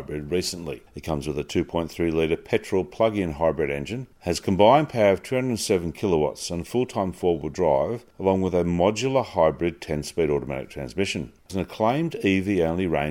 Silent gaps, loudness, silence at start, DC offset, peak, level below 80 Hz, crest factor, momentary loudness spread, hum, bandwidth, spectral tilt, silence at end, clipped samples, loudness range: none; -24 LUFS; 0 s; under 0.1%; -2 dBFS; -46 dBFS; 20 dB; 10 LU; none; 16.5 kHz; -5.5 dB/octave; 0 s; under 0.1%; 3 LU